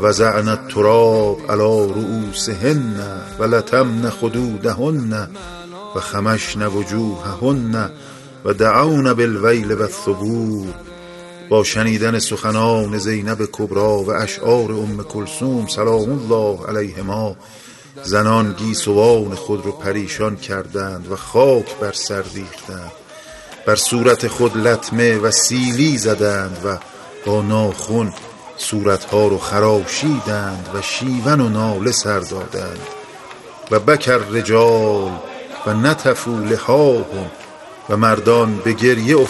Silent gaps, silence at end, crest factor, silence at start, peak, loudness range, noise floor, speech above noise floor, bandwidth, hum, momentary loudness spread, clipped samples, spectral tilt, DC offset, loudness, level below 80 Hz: none; 0 s; 16 dB; 0 s; 0 dBFS; 4 LU; -37 dBFS; 21 dB; 12 kHz; none; 17 LU; under 0.1%; -5 dB/octave; under 0.1%; -17 LUFS; -48 dBFS